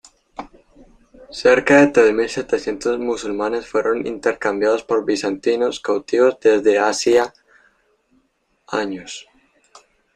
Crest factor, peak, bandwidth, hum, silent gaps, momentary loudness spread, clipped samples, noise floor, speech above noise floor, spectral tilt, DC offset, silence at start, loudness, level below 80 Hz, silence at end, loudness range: 18 dB; 0 dBFS; 10 kHz; none; none; 16 LU; under 0.1%; -65 dBFS; 48 dB; -4 dB/octave; under 0.1%; 0.4 s; -18 LUFS; -54 dBFS; 0.95 s; 3 LU